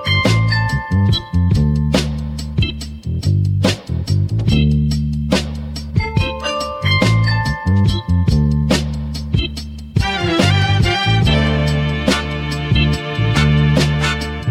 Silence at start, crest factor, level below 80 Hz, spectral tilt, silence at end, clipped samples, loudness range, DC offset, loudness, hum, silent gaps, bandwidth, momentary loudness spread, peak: 0 s; 14 dB; -26 dBFS; -6 dB/octave; 0 s; under 0.1%; 2 LU; under 0.1%; -16 LUFS; none; none; 14 kHz; 8 LU; 0 dBFS